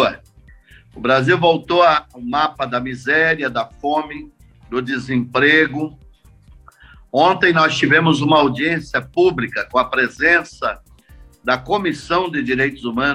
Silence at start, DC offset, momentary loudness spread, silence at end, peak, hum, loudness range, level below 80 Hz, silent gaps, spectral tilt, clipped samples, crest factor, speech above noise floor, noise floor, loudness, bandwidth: 0 s; under 0.1%; 11 LU; 0 s; -2 dBFS; none; 4 LU; -48 dBFS; none; -5.5 dB/octave; under 0.1%; 16 dB; 30 dB; -47 dBFS; -17 LUFS; 11 kHz